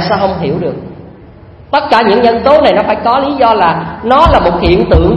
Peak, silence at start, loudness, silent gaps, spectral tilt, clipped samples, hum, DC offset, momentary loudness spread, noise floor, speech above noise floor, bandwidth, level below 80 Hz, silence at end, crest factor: 0 dBFS; 0 s; -9 LUFS; none; -7.5 dB/octave; 0.6%; none; under 0.1%; 9 LU; -34 dBFS; 26 dB; 10 kHz; -22 dBFS; 0 s; 10 dB